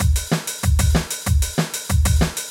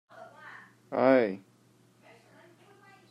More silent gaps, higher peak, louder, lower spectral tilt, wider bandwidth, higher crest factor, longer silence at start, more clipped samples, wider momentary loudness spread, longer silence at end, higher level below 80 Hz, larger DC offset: neither; first, -4 dBFS vs -10 dBFS; first, -20 LUFS vs -26 LUFS; second, -4.5 dB/octave vs -7.5 dB/octave; first, 17 kHz vs 9.6 kHz; second, 14 dB vs 22 dB; second, 0 s vs 0.2 s; neither; second, 4 LU vs 27 LU; second, 0 s vs 1.75 s; first, -22 dBFS vs -84 dBFS; neither